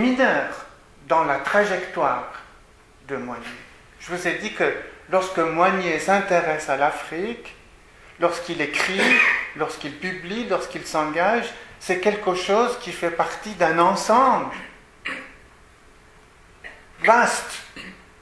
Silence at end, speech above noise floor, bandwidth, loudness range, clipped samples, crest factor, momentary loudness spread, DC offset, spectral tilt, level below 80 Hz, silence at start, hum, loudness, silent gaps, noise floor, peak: 0.25 s; 29 dB; 11 kHz; 4 LU; under 0.1%; 22 dB; 19 LU; under 0.1%; -4 dB/octave; -54 dBFS; 0 s; none; -21 LUFS; none; -51 dBFS; 0 dBFS